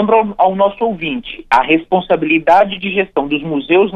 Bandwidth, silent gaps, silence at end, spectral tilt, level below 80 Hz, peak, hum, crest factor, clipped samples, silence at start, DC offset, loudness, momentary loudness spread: 9 kHz; none; 0 s; -7 dB/octave; -46 dBFS; -2 dBFS; none; 12 dB; under 0.1%; 0 s; under 0.1%; -14 LUFS; 7 LU